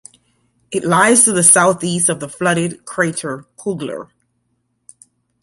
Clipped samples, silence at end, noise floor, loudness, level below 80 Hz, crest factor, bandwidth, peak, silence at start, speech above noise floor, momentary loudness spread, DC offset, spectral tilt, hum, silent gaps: under 0.1%; 1.4 s; -67 dBFS; -14 LUFS; -60 dBFS; 18 dB; 16 kHz; 0 dBFS; 0.7 s; 52 dB; 17 LU; under 0.1%; -3 dB/octave; 60 Hz at -50 dBFS; none